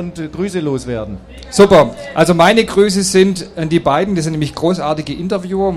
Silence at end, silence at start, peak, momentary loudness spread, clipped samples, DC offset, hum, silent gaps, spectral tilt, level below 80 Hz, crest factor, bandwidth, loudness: 0 s; 0 s; 0 dBFS; 13 LU; under 0.1%; under 0.1%; none; none; -5 dB/octave; -38 dBFS; 14 dB; 14.5 kHz; -14 LUFS